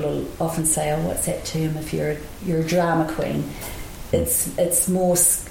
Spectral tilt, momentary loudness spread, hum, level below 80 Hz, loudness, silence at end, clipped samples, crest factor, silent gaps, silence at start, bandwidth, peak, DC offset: -4.5 dB/octave; 10 LU; none; -40 dBFS; -21 LUFS; 0 s; under 0.1%; 18 dB; none; 0 s; 17 kHz; -4 dBFS; under 0.1%